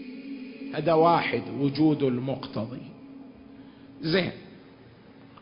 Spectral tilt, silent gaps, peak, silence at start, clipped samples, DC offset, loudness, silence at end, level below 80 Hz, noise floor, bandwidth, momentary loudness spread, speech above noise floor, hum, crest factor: -10.5 dB/octave; none; -8 dBFS; 0 s; under 0.1%; under 0.1%; -26 LUFS; 0.05 s; -62 dBFS; -51 dBFS; 5.4 kHz; 24 LU; 26 dB; none; 20 dB